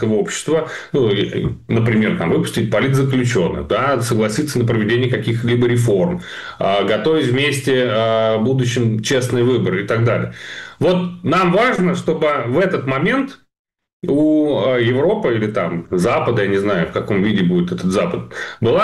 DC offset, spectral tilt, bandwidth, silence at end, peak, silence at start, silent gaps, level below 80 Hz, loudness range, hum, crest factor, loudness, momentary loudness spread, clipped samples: 0.2%; -6 dB/octave; 12.5 kHz; 0 s; -8 dBFS; 0 s; 13.59-13.65 s, 13.93-14.00 s; -46 dBFS; 1 LU; none; 8 dB; -17 LUFS; 5 LU; under 0.1%